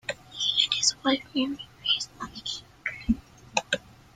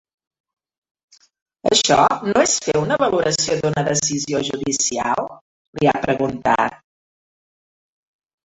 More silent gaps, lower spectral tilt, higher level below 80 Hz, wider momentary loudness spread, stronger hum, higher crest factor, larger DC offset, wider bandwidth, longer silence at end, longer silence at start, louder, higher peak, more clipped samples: second, none vs 5.41-5.73 s; second, -1.5 dB/octave vs -3 dB/octave; about the same, -50 dBFS vs -54 dBFS; first, 13 LU vs 7 LU; neither; about the same, 22 dB vs 18 dB; neither; first, 14 kHz vs 8.4 kHz; second, 0.35 s vs 1.7 s; second, 0.1 s vs 1.65 s; second, -27 LUFS vs -18 LUFS; second, -8 dBFS vs -2 dBFS; neither